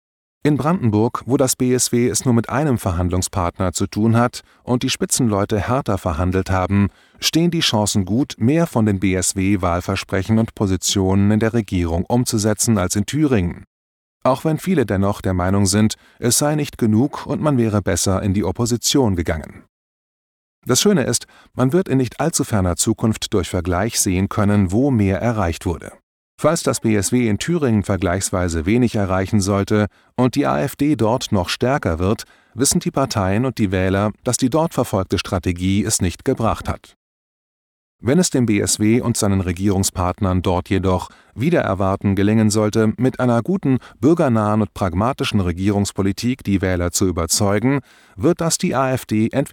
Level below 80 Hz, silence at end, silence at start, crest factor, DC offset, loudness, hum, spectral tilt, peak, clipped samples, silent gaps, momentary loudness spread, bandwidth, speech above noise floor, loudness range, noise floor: -40 dBFS; 0.05 s; 0.45 s; 14 dB; under 0.1%; -18 LUFS; none; -5 dB/octave; -4 dBFS; under 0.1%; 13.67-14.21 s, 19.69-20.62 s, 26.03-26.38 s, 36.96-37.99 s; 5 LU; 18 kHz; over 72 dB; 2 LU; under -90 dBFS